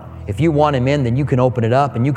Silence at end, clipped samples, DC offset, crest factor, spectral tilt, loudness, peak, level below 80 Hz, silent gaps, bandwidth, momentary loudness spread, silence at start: 0 s; under 0.1%; under 0.1%; 14 dB; -8 dB/octave; -16 LUFS; -2 dBFS; -40 dBFS; none; 9.6 kHz; 3 LU; 0 s